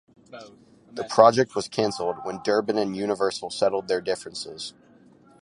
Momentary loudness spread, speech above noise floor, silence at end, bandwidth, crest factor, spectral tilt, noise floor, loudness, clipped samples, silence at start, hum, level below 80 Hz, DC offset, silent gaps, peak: 20 LU; 30 dB; 0.7 s; 11.5 kHz; 24 dB; -4.5 dB/octave; -54 dBFS; -24 LUFS; under 0.1%; 0.3 s; none; -66 dBFS; under 0.1%; none; -2 dBFS